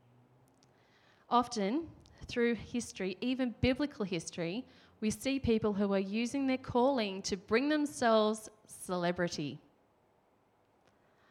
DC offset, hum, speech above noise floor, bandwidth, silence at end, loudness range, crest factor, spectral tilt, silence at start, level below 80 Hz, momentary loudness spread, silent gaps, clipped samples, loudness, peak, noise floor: under 0.1%; none; 38 dB; 15.5 kHz; 1.75 s; 4 LU; 20 dB; -5 dB/octave; 1.3 s; -60 dBFS; 10 LU; none; under 0.1%; -34 LUFS; -14 dBFS; -71 dBFS